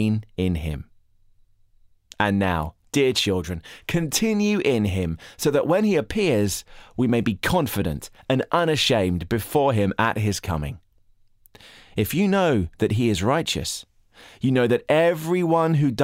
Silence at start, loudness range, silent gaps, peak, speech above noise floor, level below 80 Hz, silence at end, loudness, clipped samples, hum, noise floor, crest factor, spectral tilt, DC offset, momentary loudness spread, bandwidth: 0 s; 3 LU; none; -6 dBFS; 35 dB; -44 dBFS; 0 s; -22 LUFS; under 0.1%; none; -57 dBFS; 16 dB; -5.5 dB/octave; under 0.1%; 9 LU; 16 kHz